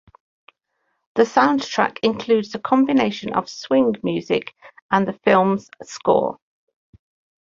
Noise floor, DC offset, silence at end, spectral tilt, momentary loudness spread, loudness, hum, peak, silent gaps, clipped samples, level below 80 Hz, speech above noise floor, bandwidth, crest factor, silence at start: -72 dBFS; under 0.1%; 1.05 s; -5.5 dB/octave; 10 LU; -20 LUFS; none; -2 dBFS; 4.82-4.89 s; under 0.1%; -62 dBFS; 53 dB; 7.6 kHz; 20 dB; 1.15 s